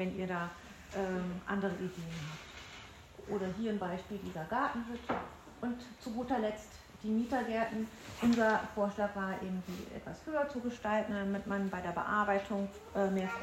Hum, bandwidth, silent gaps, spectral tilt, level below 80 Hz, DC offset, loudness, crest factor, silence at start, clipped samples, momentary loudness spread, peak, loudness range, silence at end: none; 16 kHz; none; -6 dB/octave; -62 dBFS; under 0.1%; -36 LUFS; 18 dB; 0 s; under 0.1%; 13 LU; -18 dBFS; 5 LU; 0 s